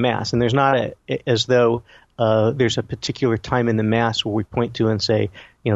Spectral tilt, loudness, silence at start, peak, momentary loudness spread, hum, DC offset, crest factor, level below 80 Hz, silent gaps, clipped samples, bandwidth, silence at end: -6 dB/octave; -20 LUFS; 0 s; -2 dBFS; 8 LU; none; under 0.1%; 16 dB; -48 dBFS; none; under 0.1%; 8 kHz; 0 s